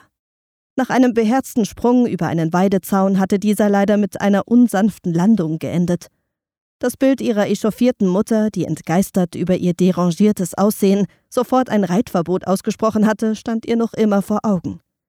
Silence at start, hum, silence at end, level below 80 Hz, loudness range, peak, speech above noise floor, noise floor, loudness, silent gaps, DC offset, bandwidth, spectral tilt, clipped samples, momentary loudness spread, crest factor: 0.75 s; none; 0.3 s; -54 dBFS; 3 LU; -4 dBFS; over 74 dB; under -90 dBFS; -17 LUFS; 6.61-6.80 s; under 0.1%; 16 kHz; -6.5 dB/octave; under 0.1%; 6 LU; 14 dB